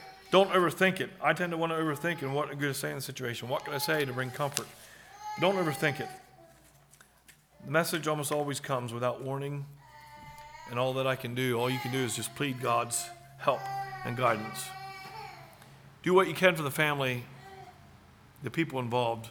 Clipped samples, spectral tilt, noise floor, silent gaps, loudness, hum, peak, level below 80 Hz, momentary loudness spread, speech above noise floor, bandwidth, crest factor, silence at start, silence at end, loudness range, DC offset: under 0.1%; -4.5 dB/octave; -61 dBFS; none; -30 LUFS; none; -2 dBFS; -68 dBFS; 20 LU; 30 dB; over 20 kHz; 30 dB; 0 s; 0 s; 4 LU; under 0.1%